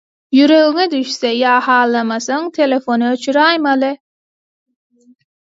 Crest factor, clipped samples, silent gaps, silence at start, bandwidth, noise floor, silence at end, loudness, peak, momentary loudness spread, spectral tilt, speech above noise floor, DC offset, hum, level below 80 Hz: 14 dB; under 0.1%; none; 0.3 s; 7.8 kHz; under -90 dBFS; 1.65 s; -14 LUFS; 0 dBFS; 8 LU; -3 dB/octave; over 77 dB; under 0.1%; none; -70 dBFS